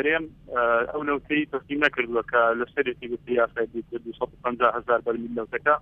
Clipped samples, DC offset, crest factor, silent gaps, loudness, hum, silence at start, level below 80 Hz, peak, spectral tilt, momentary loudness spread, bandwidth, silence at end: under 0.1%; under 0.1%; 20 dB; none; -25 LUFS; none; 0 s; -56 dBFS; -6 dBFS; -6.5 dB/octave; 9 LU; 6.6 kHz; 0 s